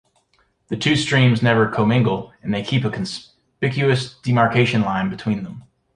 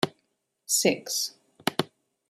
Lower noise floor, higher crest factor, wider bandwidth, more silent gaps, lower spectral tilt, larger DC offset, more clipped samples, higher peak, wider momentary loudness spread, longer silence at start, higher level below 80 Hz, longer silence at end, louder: second, -63 dBFS vs -76 dBFS; second, 18 dB vs 24 dB; second, 10.5 kHz vs 16 kHz; neither; first, -6 dB/octave vs -2.5 dB/octave; neither; neither; first, -2 dBFS vs -6 dBFS; about the same, 11 LU vs 13 LU; first, 0.7 s vs 0 s; first, -52 dBFS vs -74 dBFS; about the same, 0.35 s vs 0.45 s; first, -19 LUFS vs -27 LUFS